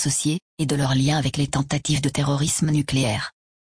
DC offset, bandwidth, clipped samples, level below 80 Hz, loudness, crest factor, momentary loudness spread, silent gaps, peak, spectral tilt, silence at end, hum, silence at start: under 0.1%; 10.5 kHz; under 0.1%; -46 dBFS; -22 LUFS; 14 dB; 5 LU; 0.42-0.57 s; -8 dBFS; -4.5 dB/octave; 0.5 s; none; 0 s